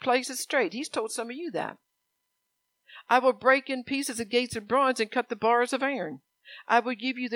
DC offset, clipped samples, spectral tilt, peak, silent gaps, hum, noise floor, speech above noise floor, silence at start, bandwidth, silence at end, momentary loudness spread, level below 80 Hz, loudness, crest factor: under 0.1%; under 0.1%; -2.5 dB/octave; -8 dBFS; none; none; -80 dBFS; 52 dB; 0 s; 17 kHz; 0 s; 10 LU; -72 dBFS; -27 LUFS; 22 dB